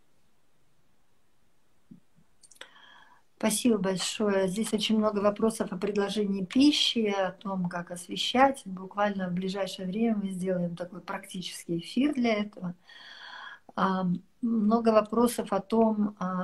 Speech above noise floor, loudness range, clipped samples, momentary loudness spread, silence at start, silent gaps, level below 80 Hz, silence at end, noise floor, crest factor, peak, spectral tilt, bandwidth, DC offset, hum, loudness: 44 dB; 5 LU; under 0.1%; 14 LU; 2.6 s; none; -66 dBFS; 0 s; -72 dBFS; 20 dB; -8 dBFS; -5 dB/octave; 13 kHz; under 0.1%; none; -28 LUFS